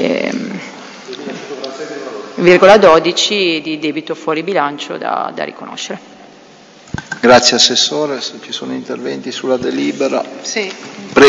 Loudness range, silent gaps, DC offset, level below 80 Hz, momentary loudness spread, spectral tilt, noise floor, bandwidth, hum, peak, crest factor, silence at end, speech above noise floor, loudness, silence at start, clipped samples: 8 LU; none; under 0.1%; -50 dBFS; 19 LU; -3 dB/octave; -41 dBFS; 11 kHz; none; 0 dBFS; 14 dB; 0 s; 28 dB; -13 LUFS; 0 s; 0.4%